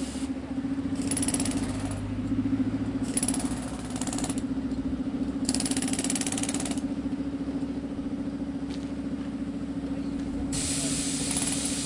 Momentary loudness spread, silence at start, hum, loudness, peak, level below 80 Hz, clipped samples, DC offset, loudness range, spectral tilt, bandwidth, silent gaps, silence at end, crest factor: 7 LU; 0 s; none; -30 LUFS; -8 dBFS; -46 dBFS; under 0.1%; under 0.1%; 4 LU; -4 dB/octave; 11.5 kHz; none; 0 s; 22 dB